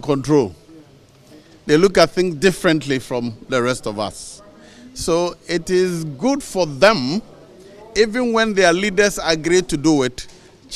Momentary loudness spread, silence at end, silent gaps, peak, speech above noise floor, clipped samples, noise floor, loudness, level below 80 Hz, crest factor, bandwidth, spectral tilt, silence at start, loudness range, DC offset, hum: 12 LU; 0 s; none; 0 dBFS; 30 dB; under 0.1%; -48 dBFS; -18 LUFS; -44 dBFS; 18 dB; 15 kHz; -4.5 dB/octave; 0.05 s; 4 LU; under 0.1%; none